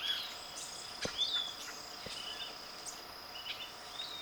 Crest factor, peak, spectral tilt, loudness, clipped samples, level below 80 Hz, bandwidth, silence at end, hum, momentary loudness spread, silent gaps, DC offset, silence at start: 20 dB; -22 dBFS; -0.5 dB/octave; -40 LUFS; under 0.1%; -68 dBFS; over 20 kHz; 0 s; none; 11 LU; none; under 0.1%; 0 s